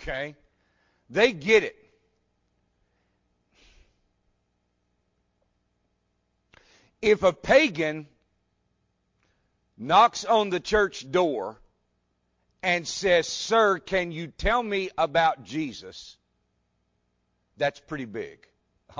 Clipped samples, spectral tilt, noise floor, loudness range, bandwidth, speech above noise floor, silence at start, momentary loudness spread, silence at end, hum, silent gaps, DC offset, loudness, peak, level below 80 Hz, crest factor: under 0.1%; -4 dB/octave; -74 dBFS; 6 LU; 7.6 kHz; 50 dB; 0 s; 17 LU; 0.65 s; 60 Hz at -65 dBFS; none; under 0.1%; -24 LUFS; -8 dBFS; -50 dBFS; 20 dB